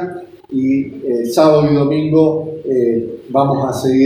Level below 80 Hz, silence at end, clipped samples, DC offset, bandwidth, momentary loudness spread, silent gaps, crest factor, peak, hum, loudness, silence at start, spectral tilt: -50 dBFS; 0 s; under 0.1%; under 0.1%; 15.5 kHz; 10 LU; none; 14 dB; 0 dBFS; none; -15 LUFS; 0 s; -7.5 dB/octave